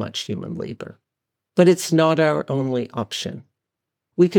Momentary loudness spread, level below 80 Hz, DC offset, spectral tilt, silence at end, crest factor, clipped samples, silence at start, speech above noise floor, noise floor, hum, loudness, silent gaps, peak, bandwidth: 17 LU; -68 dBFS; under 0.1%; -5.5 dB/octave; 0 s; 18 dB; under 0.1%; 0 s; 63 dB; -83 dBFS; none; -21 LUFS; none; -4 dBFS; 19 kHz